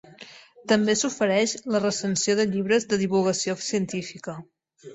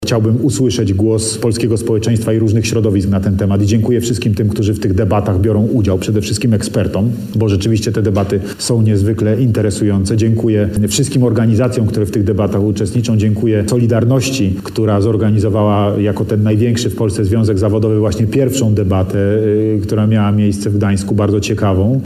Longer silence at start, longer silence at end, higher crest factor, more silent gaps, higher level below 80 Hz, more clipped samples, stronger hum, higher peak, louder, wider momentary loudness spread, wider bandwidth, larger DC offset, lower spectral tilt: first, 0.2 s vs 0 s; about the same, 0 s vs 0 s; first, 18 dB vs 10 dB; neither; second, -66 dBFS vs -38 dBFS; neither; neither; second, -8 dBFS vs -2 dBFS; second, -24 LUFS vs -14 LUFS; first, 18 LU vs 3 LU; second, 8.4 kHz vs 15 kHz; neither; second, -4 dB/octave vs -6.5 dB/octave